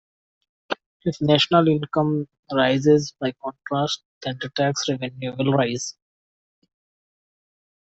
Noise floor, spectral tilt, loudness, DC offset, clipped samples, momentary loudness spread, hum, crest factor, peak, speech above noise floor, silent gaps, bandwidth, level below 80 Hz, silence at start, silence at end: under -90 dBFS; -5 dB/octave; -22 LUFS; under 0.1%; under 0.1%; 14 LU; none; 20 dB; -4 dBFS; over 68 dB; 0.86-1.00 s, 2.39-2.43 s, 4.05-4.21 s; 8.2 kHz; -62 dBFS; 0.7 s; 2 s